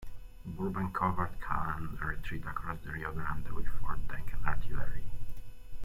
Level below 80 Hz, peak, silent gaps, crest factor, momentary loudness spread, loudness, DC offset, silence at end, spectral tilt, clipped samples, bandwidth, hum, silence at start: -40 dBFS; -12 dBFS; none; 16 dB; 16 LU; -38 LUFS; under 0.1%; 0 s; -7.5 dB/octave; under 0.1%; 12.5 kHz; none; 0 s